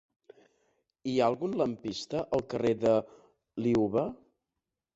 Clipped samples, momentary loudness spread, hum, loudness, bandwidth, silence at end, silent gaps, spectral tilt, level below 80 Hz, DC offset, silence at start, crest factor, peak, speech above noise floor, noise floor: under 0.1%; 10 LU; none; -30 LUFS; 8 kHz; 0.8 s; none; -6.5 dB/octave; -64 dBFS; under 0.1%; 1.05 s; 18 dB; -14 dBFS; 59 dB; -88 dBFS